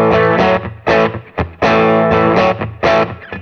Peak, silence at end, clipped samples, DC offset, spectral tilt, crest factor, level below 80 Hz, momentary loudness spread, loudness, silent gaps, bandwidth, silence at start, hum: 0 dBFS; 0 s; under 0.1%; under 0.1%; -7 dB/octave; 12 dB; -36 dBFS; 7 LU; -13 LUFS; none; 6.8 kHz; 0 s; none